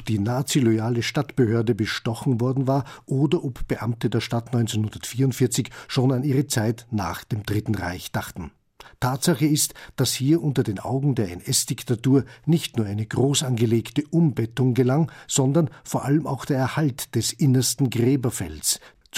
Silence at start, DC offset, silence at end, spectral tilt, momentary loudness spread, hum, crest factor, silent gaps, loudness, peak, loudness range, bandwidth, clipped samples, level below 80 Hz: 0 s; under 0.1%; 0 s; -5.5 dB/octave; 7 LU; none; 16 dB; none; -23 LUFS; -8 dBFS; 3 LU; 16 kHz; under 0.1%; -48 dBFS